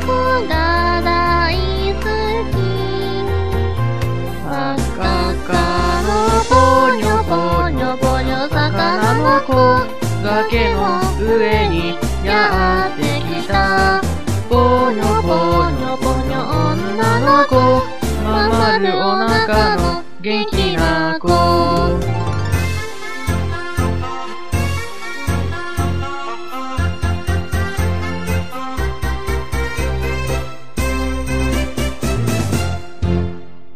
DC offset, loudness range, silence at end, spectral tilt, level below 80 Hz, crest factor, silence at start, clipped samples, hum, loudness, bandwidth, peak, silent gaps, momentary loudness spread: 5%; 7 LU; 0.25 s; -5.5 dB/octave; -26 dBFS; 16 dB; 0 s; under 0.1%; none; -17 LUFS; 15.5 kHz; 0 dBFS; none; 9 LU